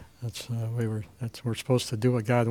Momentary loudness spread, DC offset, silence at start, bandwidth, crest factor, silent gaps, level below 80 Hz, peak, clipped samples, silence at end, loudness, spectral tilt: 12 LU; under 0.1%; 0 s; 15.5 kHz; 18 dB; none; -62 dBFS; -10 dBFS; under 0.1%; 0 s; -29 LUFS; -6.5 dB/octave